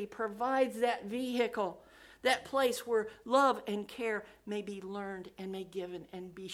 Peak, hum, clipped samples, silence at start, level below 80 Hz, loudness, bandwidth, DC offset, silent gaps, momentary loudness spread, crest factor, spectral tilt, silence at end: -14 dBFS; none; under 0.1%; 0 s; -72 dBFS; -34 LUFS; 16 kHz; under 0.1%; none; 13 LU; 20 dB; -4 dB/octave; 0 s